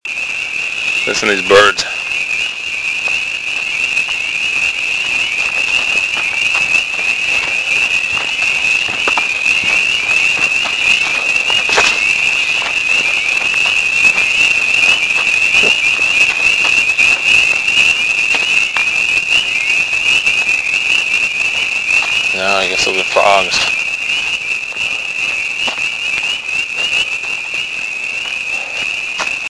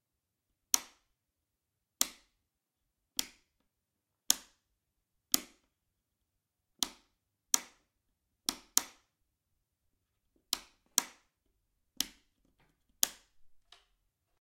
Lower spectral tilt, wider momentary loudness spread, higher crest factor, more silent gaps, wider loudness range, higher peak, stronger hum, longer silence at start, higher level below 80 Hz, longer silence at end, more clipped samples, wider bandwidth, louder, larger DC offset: first, 0 dB/octave vs 1.5 dB/octave; about the same, 7 LU vs 7 LU; second, 14 dB vs 42 dB; neither; about the same, 6 LU vs 4 LU; about the same, 0 dBFS vs 0 dBFS; neither; second, 0.05 s vs 0.75 s; first, -48 dBFS vs -76 dBFS; second, 0 s vs 1 s; neither; second, 11 kHz vs 16.5 kHz; first, -11 LUFS vs -34 LUFS; neither